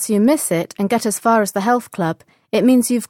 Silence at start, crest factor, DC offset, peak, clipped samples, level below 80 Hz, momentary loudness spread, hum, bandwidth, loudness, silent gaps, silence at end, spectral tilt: 0 s; 14 dB; under 0.1%; -4 dBFS; under 0.1%; -62 dBFS; 9 LU; none; 17 kHz; -17 LUFS; none; 0.05 s; -5 dB/octave